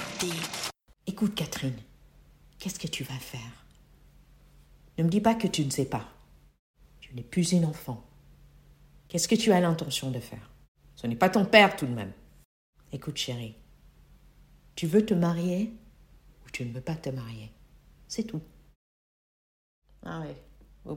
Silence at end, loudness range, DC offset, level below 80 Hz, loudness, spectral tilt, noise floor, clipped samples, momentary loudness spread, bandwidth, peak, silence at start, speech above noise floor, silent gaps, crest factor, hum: 0 s; 13 LU; under 0.1%; -58 dBFS; -28 LUFS; -5 dB/octave; -57 dBFS; under 0.1%; 20 LU; 16.5 kHz; -2 dBFS; 0 s; 29 dB; 6.59-6.74 s, 10.68-10.75 s, 12.45-12.73 s, 18.76-19.82 s; 28 dB; none